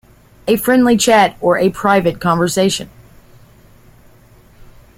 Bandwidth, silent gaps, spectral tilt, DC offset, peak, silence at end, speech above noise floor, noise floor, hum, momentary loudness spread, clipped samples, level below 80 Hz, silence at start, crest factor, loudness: 16.5 kHz; none; -4.5 dB/octave; under 0.1%; -2 dBFS; 0.35 s; 32 dB; -46 dBFS; none; 9 LU; under 0.1%; -46 dBFS; 0.45 s; 14 dB; -14 LUFS